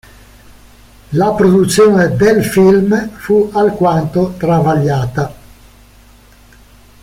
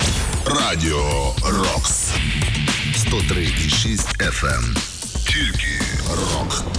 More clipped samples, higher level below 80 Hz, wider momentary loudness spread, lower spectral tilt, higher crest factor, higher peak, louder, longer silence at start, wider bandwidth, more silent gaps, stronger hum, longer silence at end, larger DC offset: neither; second, -40 dBFS vs -26 dBFS; first, 8 LU vs 4 LU; first, -6.5 dB/octave vs -3.5 dB/octave; about the same, 12 dB vs 12 dB; first, -2 dBFS vs -8 dBFS; first, -12 LUFS vs -19 LUFS; first, 1.1 s vs 0 s; first, 16 kHz vs 11 kHz; neither; neither; first, 1.7 s vs 0 s; second, under 0.1% vs 0.1%